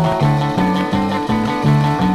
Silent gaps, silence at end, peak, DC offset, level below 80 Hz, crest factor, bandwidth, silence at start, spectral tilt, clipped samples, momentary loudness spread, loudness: none; 0 s; -4 dBFS; 0.2%; -38 dBFS; 12 dB; 13 kHz; 0 s; -7.5 dB/octave; under 0.1%; 3 LU; -16 LUFS